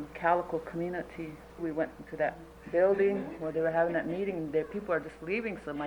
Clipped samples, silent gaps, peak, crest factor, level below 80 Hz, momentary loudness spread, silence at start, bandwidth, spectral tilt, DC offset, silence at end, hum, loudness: under 0.1%; none; -12 dBFS; 18 dB; -58 dBFS; 10 LU; 0 s; over 20 kHz; -7.5 dB/octave; under 0.1%; 0 s; none; -32 LUFS